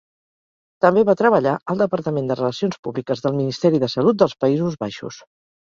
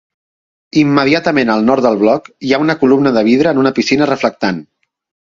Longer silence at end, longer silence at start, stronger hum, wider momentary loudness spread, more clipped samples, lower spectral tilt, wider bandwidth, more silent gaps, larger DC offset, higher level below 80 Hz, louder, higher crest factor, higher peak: about the same, 0.5 s vs 0.6 s; about the same, 0.8 s vs 0.75 s; neither; first, 11 LU vs 6 LU; neither; about the same, -7 dB/octave vs -6 dB/octave; about the same, 7.6 kHz vs 7.6 kHz; first, 1.62-1.66 s, 2.79-2.83 s vs none; neither; second, -60 dBFS vs -52 dBFS; second, -19 LUFS vs -12 LUFS; first, 18 dB vs 12 dB; about the same, -2 dBFS vs 0 dBFS